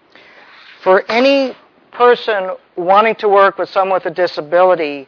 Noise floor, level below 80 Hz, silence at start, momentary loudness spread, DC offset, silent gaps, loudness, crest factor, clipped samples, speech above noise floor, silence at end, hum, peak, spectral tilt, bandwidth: -43 dBFS; -70 dBFS; 0.85 s; 9 LU; under 0.1%; none; -13 LUFS; 14 dB; under 0.1%; 30 dB; 0.05 s; none; 0 dBFS; -5.5 dB/octave; 5.4 kHz